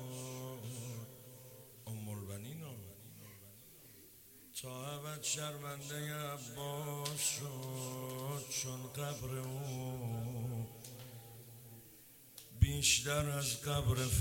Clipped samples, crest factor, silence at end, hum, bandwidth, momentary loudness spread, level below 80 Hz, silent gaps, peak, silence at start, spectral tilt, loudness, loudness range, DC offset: under 0.1%; 26 dB; 0 s; none; 17 kHz; 20 LU; -52 dBFS; none; -16 dBFS; 0 s; -3.5 dB/octave; -39 LUFS; 12 LU; under 0.1%